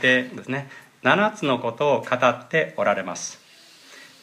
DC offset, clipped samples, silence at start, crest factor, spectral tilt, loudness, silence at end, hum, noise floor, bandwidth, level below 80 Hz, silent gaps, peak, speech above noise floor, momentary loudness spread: under 0.1%; under 0.1%; 0 s; 20 dB; -4 dB/octave; -22 LUFS; 0.2 s; none; -50 dBFS; 14.5 kHz; -74 dBFS; none; -4 dBFS; 27 dB; 11 LU